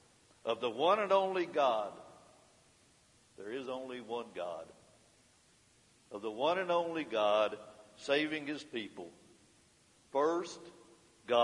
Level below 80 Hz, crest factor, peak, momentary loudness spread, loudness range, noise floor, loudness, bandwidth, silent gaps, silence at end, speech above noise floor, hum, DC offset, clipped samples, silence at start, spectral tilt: -82 dBFS; 22 dB; -16 dBFS; 20 LU; 11 LU; -67 dBFS; -35 LUFS; 11.5 kHz; none; 0 s; 33 dB; none; under 0.1%; under 0.1%; 0.45 s; -4 dB/octave